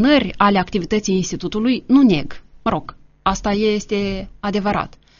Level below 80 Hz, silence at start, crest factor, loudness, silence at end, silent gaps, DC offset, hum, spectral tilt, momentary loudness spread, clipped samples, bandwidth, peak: -38 dBFS; 0 s; 18 dB; -19 LUFS; 0.3 s; none; under 0.1%; none; -4.5 dB/octave; 10 LU; under 0.1%; 7.2 kHz; -2 dBFS